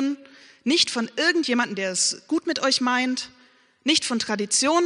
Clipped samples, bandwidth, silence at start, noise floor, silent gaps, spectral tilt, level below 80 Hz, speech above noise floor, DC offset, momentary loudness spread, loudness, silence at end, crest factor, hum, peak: under 0.1%; 10.5 kHz; 0 s; -47 dBFS; none; -1.5 dB/octave; -72 dBFS; 24 dB; under 0.1%; 9 LU; -22 LUFS; 0 s; 18 dB; none; -6 dBFS